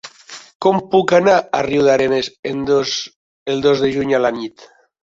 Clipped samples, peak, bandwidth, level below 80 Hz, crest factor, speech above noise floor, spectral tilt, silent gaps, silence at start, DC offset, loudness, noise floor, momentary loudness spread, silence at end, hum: under 0.1%; -2 dBFS; 7.8 kHz; -52 dBFS; 16 dB; 23 dB; -5 dB/octave; 0.55-0.60 s, 2.39-2.43 s, 3.16-3.46 s; 0.05 s; under 0.1%; -16 LUFS; -39 dBFS; 18 LU; 0.4 s; none